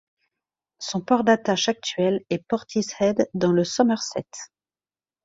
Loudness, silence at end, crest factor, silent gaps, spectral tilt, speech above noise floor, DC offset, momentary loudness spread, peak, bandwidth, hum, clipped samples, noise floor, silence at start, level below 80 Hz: -23 LUFS; 0.8 s; 20 dB; none; -4.5 dB/octave; over 67 dB; under 0.1%; 13 LU; -4 dBFS; 7.8 kHz; none; under 0.1%; under -90 dBFS; 0.8 s; -64 dBFS